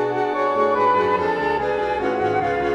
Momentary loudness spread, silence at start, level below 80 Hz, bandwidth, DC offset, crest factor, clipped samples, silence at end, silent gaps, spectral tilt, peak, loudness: 4 LU; 0 s; -48 dBFS; 8.8 kHz; under 0.1%; 14 dB; under 0.1%; 0 s; none; -6.5 dB/octave; -6 dBFS; -20 LUFS